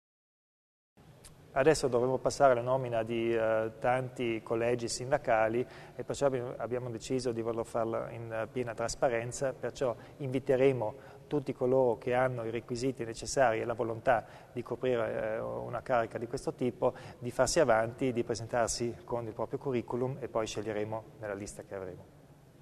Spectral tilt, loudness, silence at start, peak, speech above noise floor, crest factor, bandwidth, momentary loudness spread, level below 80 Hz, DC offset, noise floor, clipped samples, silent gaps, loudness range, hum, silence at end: -5 dB/octave; -32 LUFS; 1.25 s; -12 dBFS; 23 dB; 20 dB; 13.5 kHz; 11 LU; -58 dBFS; under 0.1%; -55 dBFS; under 0.1%; none; 5 LU; none; 0.3 s